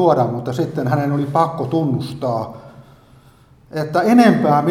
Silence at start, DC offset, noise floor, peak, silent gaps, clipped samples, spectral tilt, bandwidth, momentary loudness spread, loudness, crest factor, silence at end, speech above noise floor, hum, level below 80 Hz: 0 s; under 0.1%; -49 dBFS; 0 dBFS; none; under 0.1%; -7.5 dB/octave; 15 kHz; 12 LU; -17 LUFS; 18 dB; 0 s; 32 dB; none; -54 dBFS